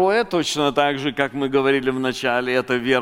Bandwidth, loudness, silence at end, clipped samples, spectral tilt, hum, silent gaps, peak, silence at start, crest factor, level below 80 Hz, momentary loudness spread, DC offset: 16.5 kHz; -20 LUFS; 0 s; under 0.1%; -4.5 dB/octave; none; none; -2 dBFS; 0 s; 18 dB; -54 dBFS; 4 LU; under 0.1%